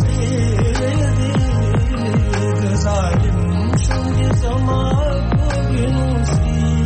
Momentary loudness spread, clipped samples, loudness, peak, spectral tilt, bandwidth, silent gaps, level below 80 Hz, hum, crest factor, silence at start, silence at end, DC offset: 1 LU; under 0.1%; -17 LUFS; -8 dBFS; -6.5 dB/octave; 8.8 kHz; none; -22 dBFS; none; 8 dB; 0 s; 0 s; under 0.1%